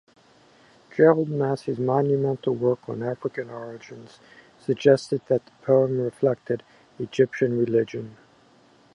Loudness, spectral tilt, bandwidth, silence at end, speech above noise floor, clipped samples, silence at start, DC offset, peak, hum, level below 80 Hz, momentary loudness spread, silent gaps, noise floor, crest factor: -23 LUFS; -7.5 dB/octave; 10.5 kHz; 0.8 s; 33 dB; under 0.1%; 0.95 s; under 0.1%; -4 dBFS; none; -68 dBFS; 17 LU; none; -57 dBFS; 20 dB